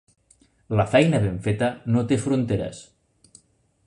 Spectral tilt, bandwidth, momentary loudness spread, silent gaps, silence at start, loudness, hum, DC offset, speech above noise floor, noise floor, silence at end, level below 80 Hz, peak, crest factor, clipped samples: -7 dB/octave; 11 kHz; 9 LU; none; 0.7 s; -23 LUFS; none; under 0.1%; 41 dB; -63 dBFS; 1.05 s; -48 dBFS; -2 dBFS; 22 dB; under 0.1%